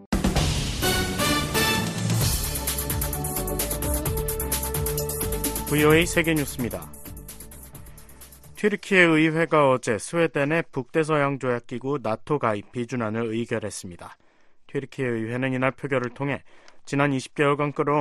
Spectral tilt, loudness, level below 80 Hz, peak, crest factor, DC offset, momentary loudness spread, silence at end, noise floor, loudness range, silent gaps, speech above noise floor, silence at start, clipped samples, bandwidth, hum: -4.5 dB/octave; -24 LUFS; -38 dBFS; -4 dBFS; 22 dB; under 0.1%; 14 LU; 0 s; -51 dBFS; 7 LU; 0.06-0.12 s; 28 dB; 0 s; under 0.1%; 14.5 kHz; none